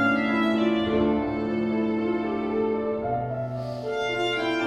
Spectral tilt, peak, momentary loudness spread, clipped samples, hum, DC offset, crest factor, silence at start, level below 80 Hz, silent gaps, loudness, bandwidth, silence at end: -6.5 dB/octave; -10 dBFS; 7 LU; under 0.1%; none; under 0.1%; 16 dB; 0 s; -50 dBFS; none; -26 LUFS; 9.6 kHz; 0 s